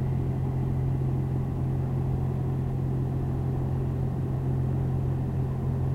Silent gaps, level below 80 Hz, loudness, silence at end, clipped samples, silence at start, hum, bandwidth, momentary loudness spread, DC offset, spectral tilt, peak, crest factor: none; -38 dBFS; -29 LUFS; 0 s; under 0.1%; 0 s; none; 3.5 kHz; 1 LU; under 0.1%; -10.5 dB/octave; -16 dBFS; 10 dB